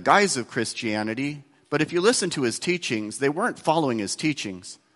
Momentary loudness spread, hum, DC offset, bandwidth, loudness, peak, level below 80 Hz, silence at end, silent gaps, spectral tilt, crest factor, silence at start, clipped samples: 10 LU; none; under 0.1%; 12 kHz; -24 LUFS; -2 dBFS; -64 dBFS; 0.2 s; none; -3.5 dB/octave; 22 dB; 0 s; under 0.1%